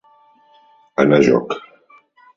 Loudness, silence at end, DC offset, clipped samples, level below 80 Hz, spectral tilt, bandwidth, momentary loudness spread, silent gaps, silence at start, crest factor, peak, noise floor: -16 LUFS; 0.8 s; under 0.1%; under 0.1%; -56 dBFS; -7 dB/octave; 7.6 kHz; 15 LU; none; 1 s; 20 dB; 0 dBFS; -53 dBFS